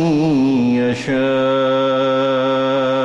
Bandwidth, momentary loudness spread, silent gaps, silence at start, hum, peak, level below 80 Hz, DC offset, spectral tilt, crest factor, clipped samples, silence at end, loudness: 8.6 kHz; 2 LU; none; 0 s; none; -8 dBFS; -52 dBFS; under 0.1%; -6.5 dB/octave; 8 dB; under 0.1%; 0 s; -16 LUFS